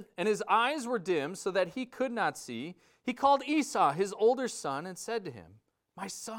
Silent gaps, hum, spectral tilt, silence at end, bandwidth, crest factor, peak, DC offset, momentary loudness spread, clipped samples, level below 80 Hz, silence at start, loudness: none; none; -4 dB/octave; 0 s; 17 kHz; 20 dB; -12 dBFS; under 0.1%; 13 LU; under 0.1%; -74 dBFS; 0 s; -31 LUFS